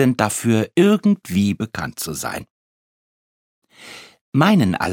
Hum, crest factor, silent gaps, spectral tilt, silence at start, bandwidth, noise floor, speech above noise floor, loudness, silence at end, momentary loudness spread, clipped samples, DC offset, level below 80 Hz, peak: none; 20 dB; 2.50-3.62 s, 4.21-4.32 s; -5.5 dB/octave; 0 s; 17.5 kHz; -41 dBFS; 24 dB; -19 LUFS; 0 s; 16 LU; under 0.1%; under 0.1%; -54 dBFS; 0 dBFS